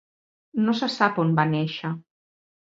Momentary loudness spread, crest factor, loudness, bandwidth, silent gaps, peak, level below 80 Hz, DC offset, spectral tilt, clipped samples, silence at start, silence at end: 11 LU; 22 dB; -24 LUFS; 7.8 kHz; none; -4 dBFS; -70 dBFS; under 0.1%; -7 dB/octave; under 0.1%; 0.55 s; 0.7 s